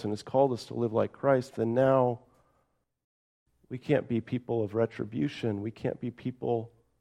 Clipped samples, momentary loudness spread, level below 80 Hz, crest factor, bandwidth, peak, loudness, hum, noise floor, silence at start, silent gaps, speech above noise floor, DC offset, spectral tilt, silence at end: under 0.1%; 10 LU; -68 dBFS; 20 dB; 11 kHz; -10 dBFS; -30 LUFS; none; -74 dBFS; 0 s; 3.04-3.46 s; 45 dB; under 0.1%; -8 dB/octave; 0.3 s